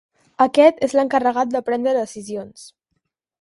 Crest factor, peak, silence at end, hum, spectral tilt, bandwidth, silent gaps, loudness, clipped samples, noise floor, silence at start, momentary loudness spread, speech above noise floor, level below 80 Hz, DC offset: 18 dB; 0 dBFS; 0.75 s; none; -4.5 dB/octave; 11.5 kHz; none; -18 LUFS; under 0.1%; -75 dBFS; 0.4 s; 17 LU; 56 dB; -64 dBFS; under 0.1%